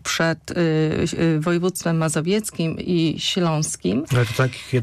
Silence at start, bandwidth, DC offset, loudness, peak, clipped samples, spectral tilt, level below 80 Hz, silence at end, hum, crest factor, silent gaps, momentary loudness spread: 0.05 s; 14.5 kHz; under 0.1%; -21 LUFS; -10 dBFS; under 0.1%; -5 dB/octave; -50 dBFS; 0 s; none; 12 dB; none; 3 LU